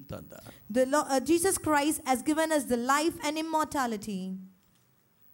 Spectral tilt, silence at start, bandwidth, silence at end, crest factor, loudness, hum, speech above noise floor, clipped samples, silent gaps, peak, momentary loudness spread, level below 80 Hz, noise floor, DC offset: -3.5 dB/octave; 0 s; 17 kHz; 0.85 s; 16 dB; -28 LUFS; none; 38 dB; under 0.1%; none; -14 dBFS; 17 LU; -60 dBFS; -67 dBFS; under 0.1%